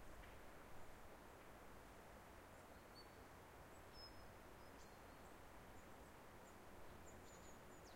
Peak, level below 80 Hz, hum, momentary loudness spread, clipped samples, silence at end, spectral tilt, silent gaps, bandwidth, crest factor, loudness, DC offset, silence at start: -46 dBFS; -70 dBFS; none; 1 LU; under 0.1%; 0 s; -4 dB/octave; none; 16 kHz; 14 dB; -62 LUFS; under 0.1%; 0 s